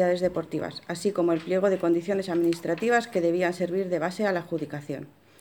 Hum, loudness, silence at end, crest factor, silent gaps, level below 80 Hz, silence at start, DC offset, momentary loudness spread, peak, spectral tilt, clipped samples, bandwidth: none; -27 LUFS; 0.35 s; 16 dB; none; -66 dBFS; 0 s; under 0.1%; 9 LU; -10 dBFS; -6 dB/octave; under 0.1%; 19 kHz